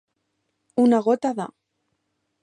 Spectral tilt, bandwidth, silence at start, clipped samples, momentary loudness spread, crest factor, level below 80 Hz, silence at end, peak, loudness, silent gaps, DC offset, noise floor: -6.5 dB/octave; 10 kHz; 0.75 s; under 0.1%; 14 LU; 18 dB; -74 dBFS; 0.95 s; -8 dBFS; -21 LUFS; none; under 0.1%; -75 dBFS